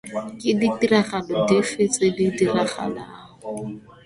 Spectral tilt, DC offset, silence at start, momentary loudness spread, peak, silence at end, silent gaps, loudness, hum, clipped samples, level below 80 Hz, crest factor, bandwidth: -5 dB/octave; under 0.1%; 0.05 s; 15 LU; -4 dBFS; 0.15 s; none; -21 LUFS; none; under 0.1%; -58 dBFS; 18 dB; 11.5 kHz